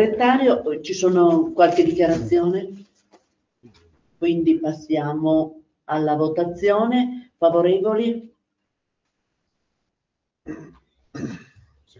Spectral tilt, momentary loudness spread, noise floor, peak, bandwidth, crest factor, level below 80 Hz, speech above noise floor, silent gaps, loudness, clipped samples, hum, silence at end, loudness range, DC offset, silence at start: -6.5 dB/octave; 17 LU; -80 dBFS; -2 dBFS; 7.6 kHz; 18 dB; -56 dBFS; 62 dB; none; -20 LUFS; under 0.1%; none; 0.6 s; 12 LU; under 0.1%; 0 s